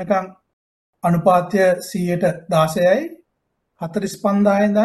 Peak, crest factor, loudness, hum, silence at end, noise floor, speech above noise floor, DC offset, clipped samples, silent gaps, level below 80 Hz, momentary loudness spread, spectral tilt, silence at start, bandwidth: -2 dBFS; 16 dB; -18 LUFS; none; 0 s; -73 dBFS; 55 dB; under 0.1%; under 0.1%; 0.53-0.93 s; -58 dBFS; 10 LU; -6.5 dB/octave; 0 s; 12.5 kHz